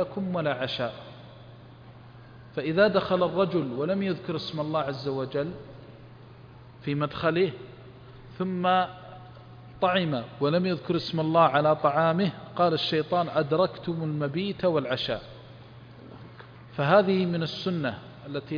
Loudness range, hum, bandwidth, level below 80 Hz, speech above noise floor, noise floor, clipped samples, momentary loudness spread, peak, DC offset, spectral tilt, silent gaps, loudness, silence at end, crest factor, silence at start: 7 LU; none; 5.2 kHz; -60 dBFS; 22 dB; -48 dBFS; under 0.1%; 24 LU; -8 dBFS; under 0.1%; -8 dB/octave; none; -27 LUFS; 0 s; 20 dB; 0 s